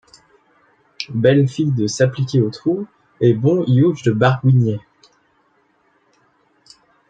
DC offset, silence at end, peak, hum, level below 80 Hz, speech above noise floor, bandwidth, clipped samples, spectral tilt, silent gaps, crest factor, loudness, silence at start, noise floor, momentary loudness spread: under 0.1%; 2.3 s; -2 dBFS; none; -58 dBFS; 45 dB; 7.8 kHz; under 0.1%; -7 dB/octave; none; 18 dB; -17 LUFS; 1 s; -60 dBFS; 11 LU